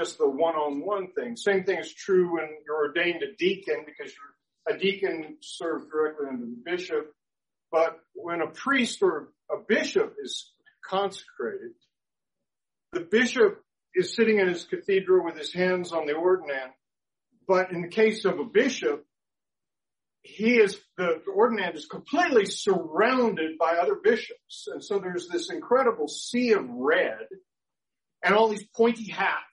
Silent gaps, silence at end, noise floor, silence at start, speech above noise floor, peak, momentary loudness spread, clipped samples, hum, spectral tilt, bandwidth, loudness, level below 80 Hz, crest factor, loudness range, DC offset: none; 0.1 s; under -90 dBFS; 0 s; over 64 dB; -8 dBFS; 13 LU; under 0.1%; none; -4.5 dB/octave; 11 kHz; -26 LUFS; -76 dBFS; 18 dB; 6 LU; under 0.1%